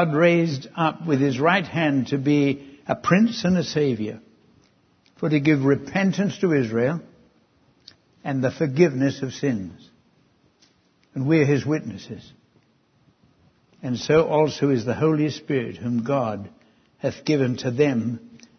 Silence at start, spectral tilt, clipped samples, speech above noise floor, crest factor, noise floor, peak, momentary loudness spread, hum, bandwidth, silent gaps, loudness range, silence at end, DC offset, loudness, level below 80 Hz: 0 s; -7 dB/octave; under 0.1%; 40 dB; 20 dB; -62 dBFS; -4 dBFS; 13 LU; none; 6.6 kHz; none; 5 LU; 0.2 s; under 0.1%; -22 LUFS; -60 dBFS